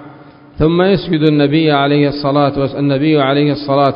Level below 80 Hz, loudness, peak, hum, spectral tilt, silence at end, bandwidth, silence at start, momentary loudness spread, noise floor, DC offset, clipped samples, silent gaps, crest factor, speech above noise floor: -38 dBFS; -13 LUFS; 0 dBFS; none; -10 dB/octave; 0 s; 5.4 kHz; 0 s; 4 LU; -38 dBFS; under 0.1%; under 0.1%; none; 12 dB; 26 dB